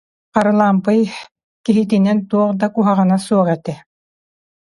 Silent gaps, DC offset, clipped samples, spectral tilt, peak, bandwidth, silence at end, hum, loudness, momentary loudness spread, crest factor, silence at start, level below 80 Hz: 1.31-1.35 s, 1.44-1.64 s; under 0.1%; under 0.1%; -7.5 dB/octave; 0 dBFS; 11.5 kHz; 1 s; none; -16 LUFS; 10 LU; 16 dB; 0.35 s; -60 dBFS